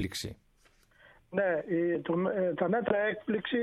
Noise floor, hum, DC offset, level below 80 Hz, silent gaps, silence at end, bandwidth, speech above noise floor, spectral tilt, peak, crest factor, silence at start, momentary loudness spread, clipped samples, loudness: -65 dBFS; none; under 0.1%; -62 dBFS; none; 0 s; 14 kHz; 35 dB; -6 dB/octave; -14 dBFS; 16 dB; 0 s; 8 LU; under 0.1%; -31 LUFS